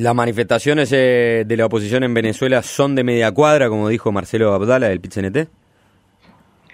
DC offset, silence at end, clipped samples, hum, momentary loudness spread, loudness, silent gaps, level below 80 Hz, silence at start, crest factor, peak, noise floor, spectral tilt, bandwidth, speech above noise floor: under 0.1%; 1.3 s; under 0.1%; none; 7 LU; -16 LUFS; none; -54 dBFS; 0 s; 16 dB; -2 dBFS; -56 dBFS; -6 dB/octave; 16 kHz; 40 dB